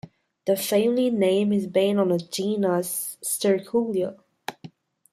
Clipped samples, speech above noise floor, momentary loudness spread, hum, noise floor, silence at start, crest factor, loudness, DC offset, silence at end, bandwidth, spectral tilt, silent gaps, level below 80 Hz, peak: under 0.1%; 25 dB; 11 LU; none; -47 dBFS; 0.05 s; 16 dB; -24 LUFS; under 0.1%; 0.45 s; 15.5 kHz; -5 dB/octave; none; -70 dBFS; -8 dBFS